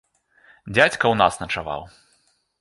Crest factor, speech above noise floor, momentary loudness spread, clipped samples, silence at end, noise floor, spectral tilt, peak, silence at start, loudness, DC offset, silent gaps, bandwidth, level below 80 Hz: 22 dB; 44 dB; 13 LU; under 0.1%; 0.75 s; -64 dBFS; -4 dB/octave; -2 dBFS; 0.65 s; -20 LUFS; under 0.1%; none; 11.5 kHz; -50 dBFS